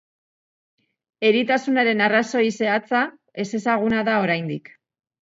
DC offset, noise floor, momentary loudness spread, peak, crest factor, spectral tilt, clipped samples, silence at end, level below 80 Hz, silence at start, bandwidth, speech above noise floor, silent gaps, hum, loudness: under 0.1%; under -90 dBFS; 10 LU; -6 dBFS; 18 dB; -5 dB/octave; under 0.1%; 0.65 s; -62 dBFS; 1.2 s; 7.8 kHz; over 70 dB; none; none; -21 LUFS